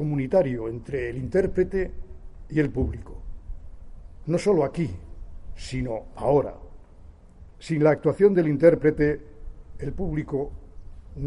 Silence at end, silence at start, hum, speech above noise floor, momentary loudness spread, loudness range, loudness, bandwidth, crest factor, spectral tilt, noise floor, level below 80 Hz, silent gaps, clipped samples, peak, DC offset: 0 s; 0 s; none; 24 dB; 24 LU; 6 LU; -24 LUFS; 11 kHz; 22 dB; -8 dB/octave; -47 dBFS; -40 dBFS; none; under 0.1%; -4 dBFS; under 0.1%